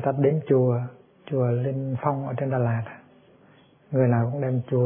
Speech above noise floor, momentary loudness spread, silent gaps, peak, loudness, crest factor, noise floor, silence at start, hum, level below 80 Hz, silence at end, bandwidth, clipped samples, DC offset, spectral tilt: 32 dB; 8 LU; none; -8 dBFS; -25 LUFS; 16 dB; -56 dBFS; 0 s; none; -66 dBFS; 0 s; 3.6 kHz; under 0.1%; under 0.1%; -13 dB/octave